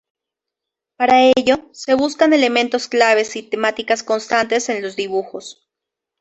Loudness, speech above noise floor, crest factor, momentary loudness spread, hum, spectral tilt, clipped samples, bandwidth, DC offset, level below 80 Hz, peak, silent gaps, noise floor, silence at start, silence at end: -16 LUFS; 67 dB; 16 dB; 10 LU; none; -2.5 dB/octave; under 0.1%; 8.4 kHz; under 0.1%; -58 dBFS; -2 dBFS; none; -84 dBFS; 1 s; 0.7 s